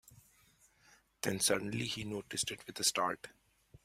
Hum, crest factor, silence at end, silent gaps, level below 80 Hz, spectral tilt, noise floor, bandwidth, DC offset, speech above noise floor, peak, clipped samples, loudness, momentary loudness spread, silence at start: none; 22 dB; 0.05 s; none; -70 dBFS; -2.5 dB/octave; -68 dBFS; 16 kHz; under 0.1%; 32 dB; -16 dBFS; under 0.1%; -35 LUFS; 9 LU; 0.1 s